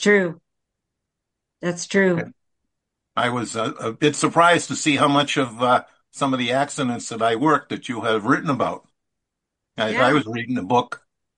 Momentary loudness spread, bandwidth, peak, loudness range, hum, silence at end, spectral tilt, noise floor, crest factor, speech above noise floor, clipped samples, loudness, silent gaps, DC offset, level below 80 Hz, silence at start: 11 LU; 11.5 kHz; -2 dBFS; 5 LU; none; 0.4 s; -4.5 dB/octave; -82 dBFS; 20 dB; 61 dB; under 0.1%; -21 LUFS; none; under 0.1%; -64 dBFS; 0 s